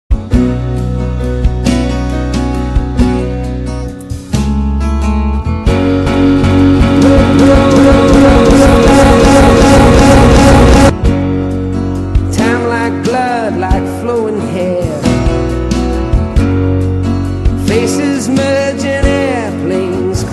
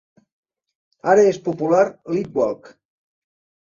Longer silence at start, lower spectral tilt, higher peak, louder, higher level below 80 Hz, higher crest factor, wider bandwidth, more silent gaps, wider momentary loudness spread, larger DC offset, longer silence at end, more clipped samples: second, 0.1 s vs 1.05 s; about the same, -6.5 dB/octave vs -6.5 dB/octave; about the same, 0 dBFS vs -2 dBFS; first, -10 LUFS vs -19 LUFS; first, -16 dBFS vs -66 dBFS; second, 8 dB vs 18 dB; first, 12.5 kHz vs 7.4 kHz; neither; about the same, 10 LU vs 11 LU; neither; second, 0 s vs 1.05 s; neither